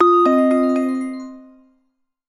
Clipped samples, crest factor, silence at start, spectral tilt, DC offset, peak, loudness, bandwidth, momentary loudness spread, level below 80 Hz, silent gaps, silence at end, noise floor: under 0.1%; 16 dB; 0 s; -5.5 dB/octave; under 0.1%; -2 dBFS; -17 LUFS; 10.5 kHz; 18 LU; -66 dBFS; none; 0.85 s; -68 dBFS